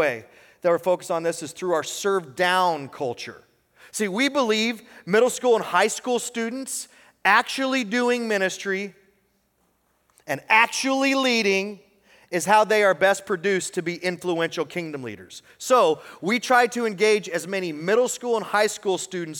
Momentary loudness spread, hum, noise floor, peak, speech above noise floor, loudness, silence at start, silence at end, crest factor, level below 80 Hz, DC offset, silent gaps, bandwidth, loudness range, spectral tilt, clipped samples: 12 LU; none; -68 dBFS; -4 dBFS; 45 dB; -22 LUFS; 0 s; 0 s; 20 dB; -74 dBFS; under 0.1%; none; 18.5 kHz; 3 LU; -3 dB/octave; under 0.1%